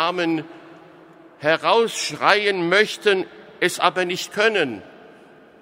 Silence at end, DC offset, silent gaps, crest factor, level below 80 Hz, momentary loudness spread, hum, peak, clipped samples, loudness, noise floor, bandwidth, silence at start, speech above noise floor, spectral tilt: 0.65 s; under 0.1%; none; 22 dB; -72 dBFS; 9 LU; none; 0 dBFS; under 0.1%; -20 LUFS; -48 dBFS; 16 kHz; 0 s; 28 dB; -3 dB/octave